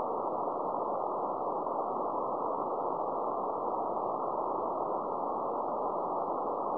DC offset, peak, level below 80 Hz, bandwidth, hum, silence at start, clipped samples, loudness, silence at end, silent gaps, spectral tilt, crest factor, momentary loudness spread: 0.1%; -20 dBFS; -74 dBFS; 5.4 kHz; none; 0 s; under 0.1%; -34 LUFS; 0 s; none; -9 dB/octave; 12 dB; 0 LU